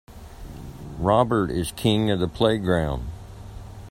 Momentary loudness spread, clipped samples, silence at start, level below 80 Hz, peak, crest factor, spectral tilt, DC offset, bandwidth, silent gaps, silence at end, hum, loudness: 21 LU; under 0.1%; 0.1 s; -40 dBFS; -4 dBFS; 20 dB; -6 dB/octave; under 0.1%; 16 kHz; none; 0 s; none; -23 LUFS